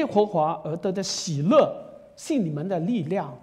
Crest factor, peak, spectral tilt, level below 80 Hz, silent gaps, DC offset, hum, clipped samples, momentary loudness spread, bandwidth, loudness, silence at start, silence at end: 18 dB; -6 dBFS; -5.5 dB/octave; -66 dBFS; none; under 0.1%; none; under 0.1%; 9 LU; 13.5 kHz; -24 LUFS; 0 s; 0.05 s